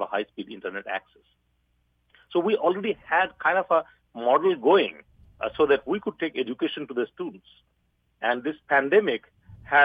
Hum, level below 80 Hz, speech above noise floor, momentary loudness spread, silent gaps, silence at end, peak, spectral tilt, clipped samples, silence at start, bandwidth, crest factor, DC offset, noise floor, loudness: 60 Hz at -70 dBFS; -64 dBFS; 45 dB; 13 LU; none; 0 s; -6 dBFS; -7 dB/octave; under 0.1%; 0 s; 4.9 kHz; 20 dB; under 0.1%; -70 dBFS; -25 LUFS